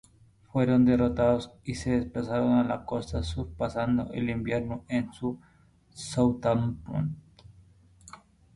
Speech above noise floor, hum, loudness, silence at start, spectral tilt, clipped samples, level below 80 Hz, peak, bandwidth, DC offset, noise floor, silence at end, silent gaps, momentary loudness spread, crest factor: 31 dB; none; -28 LUFS; 0.55 s; -7 dB/octave; under 0.1%; -46 dBFS; -10 dBFS; 11 kHz; under 0.1%; -59 dBFS; 0.4 s; none; 12 LU; 18 dB